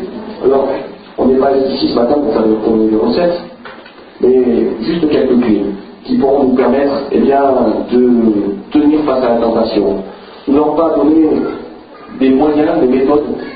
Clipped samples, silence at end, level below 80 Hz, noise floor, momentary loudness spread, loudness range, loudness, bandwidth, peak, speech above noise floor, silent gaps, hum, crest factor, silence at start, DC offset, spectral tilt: under 0.1%; 0 s; -42 dBFS; -34 dBFS; 12 LU; 2 LU; -12 LUFS; 5 kHz; 0 dBFS; 23 dB; none; none; 12 dB; 0 s; under 0.1%; -12 dB/octave